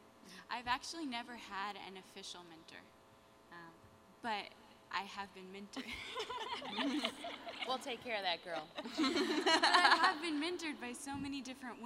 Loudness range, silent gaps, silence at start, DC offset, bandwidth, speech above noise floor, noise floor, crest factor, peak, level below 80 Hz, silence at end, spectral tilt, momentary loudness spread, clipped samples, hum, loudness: 14 LU; none; 0 s; under 0.1%; 16 kHz; 25 dB; -64 dBFS; 26 dB; -14 dBFS; -74 dBFS; 0 s; -2 dB/octave; 22 LU; under 0.1%; none; -37 LUFS